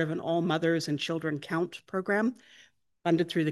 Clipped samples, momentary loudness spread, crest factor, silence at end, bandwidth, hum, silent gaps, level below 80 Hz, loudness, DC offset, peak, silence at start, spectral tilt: under 0.1%; 6 LU; 18 dB; 0 s; 12.5 kHz; none; none; -76 dBFS; -30 LUFS; under 0.1%; -12 dBFS; 0 s; -6 dB/octave